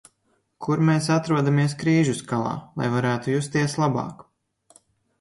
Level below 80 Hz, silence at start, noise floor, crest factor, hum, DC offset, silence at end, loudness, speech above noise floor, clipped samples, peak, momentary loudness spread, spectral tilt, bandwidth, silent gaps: -60 dBFS; 0.6 s; -69 dBFS; 16 dB; none; under 0.1%; 1.05 s; -23 LUFS; 47 dB; under 0.1%; -8 dBFS; 8 LU; -6.5 dB/octave; 11.5 kHz; none